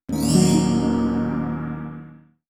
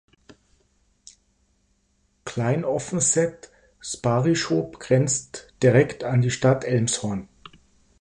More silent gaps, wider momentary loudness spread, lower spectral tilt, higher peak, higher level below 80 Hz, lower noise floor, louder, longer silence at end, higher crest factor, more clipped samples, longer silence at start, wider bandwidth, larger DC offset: neither; about the same, 16 LU vs 14 LU; about the same, -6 dB/octave vs -5 dB/octave; about the same, -4 dBFS vs -6 dBFS; first, -42 dBFS vs -56 dBFS; second, -44 dBFS vs -67 dBFS; about the same, -21 LUFS vs -23 LUFS; second, 0.3 s vs 0.8 s; about the same, 16 dB vs 20 dB; neither; second, 0.1 s vs 2.25 s; first, 16 kHz vs 11 kHz; neither